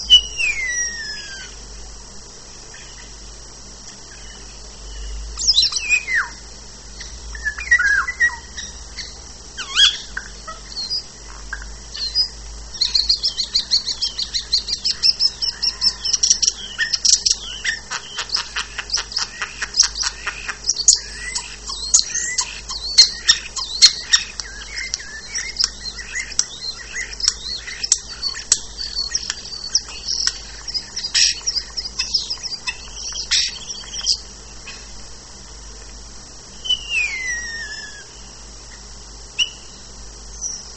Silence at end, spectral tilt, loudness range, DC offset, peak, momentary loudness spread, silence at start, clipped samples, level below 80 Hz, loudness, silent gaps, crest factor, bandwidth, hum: 0 s; 1.5 dB/octave; 10 LU; 0.4%; 0 dBFS; 23 LU; 0 s; under 0.1%; -40 dBFS; -18 LUFS; none; 22 dB; 11 kHz; none